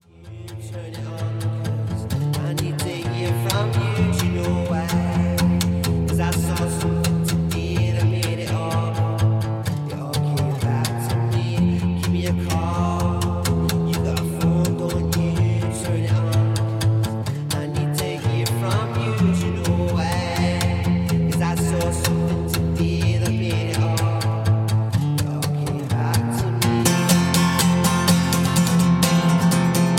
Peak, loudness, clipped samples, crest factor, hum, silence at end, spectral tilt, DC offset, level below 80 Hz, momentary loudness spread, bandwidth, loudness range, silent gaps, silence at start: 0 dBFS; -21 LUFS; under 0.1%; 20 dB; none; 0 s; -5.5 dB/octave; under 0.1%; -38 dBFS; 7 LU; 17 kHz; 4 LU; none; 0.2 s